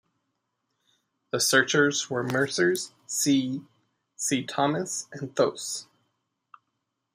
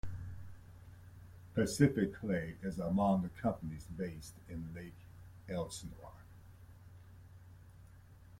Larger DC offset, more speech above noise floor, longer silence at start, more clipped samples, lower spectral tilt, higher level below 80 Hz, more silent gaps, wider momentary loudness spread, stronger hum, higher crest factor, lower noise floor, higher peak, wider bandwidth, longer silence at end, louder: neither; first, 54 dB vs 21 dB; first, 1.35 s vs 0.05 s; neither; second, -3 dB/octave vs -6.5 dB/octave; second, -74 dBFS vs -58 dBFS; neither; second, 12 LU vs 26 LU; neither; about the same, 22 dB vs 24 dB; first, -80 dBFS vs -58 dBFS; first, -6 dBFS vs -14 dBFS; about the same, 15.5 kHz vs 16.5 kHz; first, 1.3 s vs 0.05 s; first, -26 LUFS vs -37 LUFS